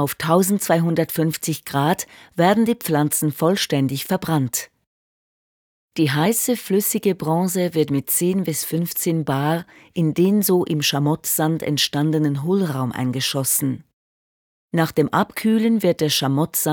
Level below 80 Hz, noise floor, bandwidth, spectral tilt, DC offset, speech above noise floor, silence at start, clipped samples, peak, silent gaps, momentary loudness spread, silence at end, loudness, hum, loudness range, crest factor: -62 dBFS; under -90 dBFS; over 20 kHz; -4.5 dB/octave; under 0.1%; over 70 dB; 0 s; under 0.1%; -2 dBFS; 4.87-5.89 s, 13.93-14.69 s; 6 LU; 0 s; -20 LUFS; none; 3 LU; 18 dB